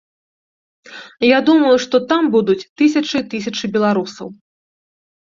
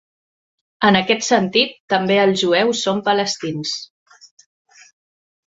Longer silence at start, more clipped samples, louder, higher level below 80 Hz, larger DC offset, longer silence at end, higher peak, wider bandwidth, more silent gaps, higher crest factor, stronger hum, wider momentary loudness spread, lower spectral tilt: about the same, 0.9 s vs 0.8 s; neither; about the same, -15 LUFS vs -17 LUFS; about the same, -60 dBFS vs -62 dBFS; neither; second, 0.9 s vs 1.7 s; about the same, -2 dBFS vs -2 dBFS; about the same, 7.6 kHz vs 8 kHz; about the same, 2.69-2.76 s vs 1.80-1.88 s; about the same, 16 dB vs 18 dB; neither; first, 19 LU vs 8 LU; about the same, -5 dB/octave vs -4 dB/octave